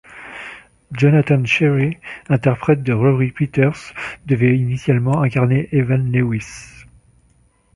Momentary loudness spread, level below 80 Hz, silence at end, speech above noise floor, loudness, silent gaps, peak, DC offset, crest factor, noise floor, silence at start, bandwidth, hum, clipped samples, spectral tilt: 17 LU; -48 dBFS; 1.1 s; 40 dB; -17 LUFS; none; -2 dBFS; under 0.1%; 16 dB; -56 dBFS; 0.1 s; 11 kHz; none; under 0.1%; -8 dB/octave